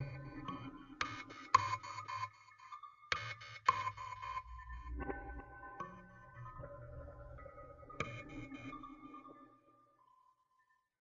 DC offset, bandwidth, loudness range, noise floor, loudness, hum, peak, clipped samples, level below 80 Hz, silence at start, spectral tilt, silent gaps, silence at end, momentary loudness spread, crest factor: under 0.1%; 7.2 kHz; 12 LU; -77 dBFS; -43 LUFS; none; -14 dBFS; under 0.1%; -58 dBFS; 0 s; -2.5 dB/octave; none; 1.2 s; 19 LU; 32 dB